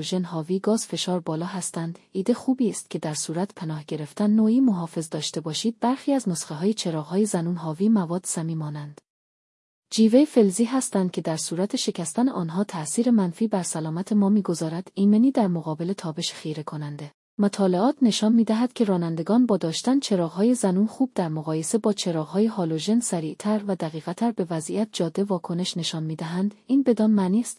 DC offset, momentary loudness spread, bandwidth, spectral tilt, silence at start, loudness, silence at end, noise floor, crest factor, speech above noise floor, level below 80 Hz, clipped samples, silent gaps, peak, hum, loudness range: under 0.1%; 9 LU; 12 kHz; -5.5 dB/octave; 0 s; -24 LUFS; 0.05 s; under -90 dBFS; 18 dB; over 67 dB; -74 dBFS; under 0.1%; 9.10-9.82 s, 17.14-17.37 s; -6 dBFS; none; 4 LU